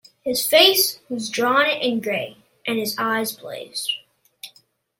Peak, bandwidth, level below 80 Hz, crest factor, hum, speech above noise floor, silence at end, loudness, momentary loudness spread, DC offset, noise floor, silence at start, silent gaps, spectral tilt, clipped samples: -2 dBFS; 16.5 kHz; -70 dBFS; 20 dB; none; 37 dB; 0.5 s; -20 LUFS; 21 LU; under 0.1%; -58 dBFS; 0.25 s; none; -1.5 dB/octave; under 0.1%